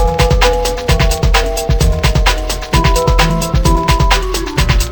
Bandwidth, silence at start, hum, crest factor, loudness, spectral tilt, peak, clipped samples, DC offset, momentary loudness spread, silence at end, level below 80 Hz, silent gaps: over 20 kHz; 0 s; none; 12 dB; -13 LUFS; -4.5 dB/octave; 0 dBFS; under 0.1%; 0.5%; 4 LU; 0 s; -14 dBFS; none